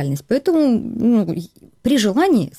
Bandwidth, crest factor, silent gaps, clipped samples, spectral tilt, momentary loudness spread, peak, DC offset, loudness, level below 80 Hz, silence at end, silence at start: 16 kHz; 10 dB; none; under 0.1%; -6 dB/octave; 9 LU; -8 dBFS; under 0.1%; -17 LUFS; -50 dBFS; 0.1 s; 0 s